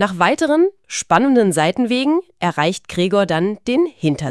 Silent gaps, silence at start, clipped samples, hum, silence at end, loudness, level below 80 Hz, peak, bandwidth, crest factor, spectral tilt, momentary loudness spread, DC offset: none; 0 s; under 0.1%; none; 0 s; -17 LUFS; -54 dBFS; 0 dBFS; 12 kHz; 16 dB; -5 dB/octave; 6 LU; 0.2%